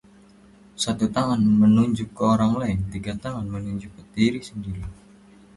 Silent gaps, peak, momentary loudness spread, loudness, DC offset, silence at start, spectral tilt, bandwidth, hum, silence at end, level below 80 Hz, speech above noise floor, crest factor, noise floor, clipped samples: none; -6 dBFS; 16 LU; -23 LUFS; under 0.1%; 0.8 s; -6.5 dB/octave; 11.5 kHz; none; 0.65 s; -46 dBFS; 29 dB; 16 dB; -51 dBFS; under 0.1%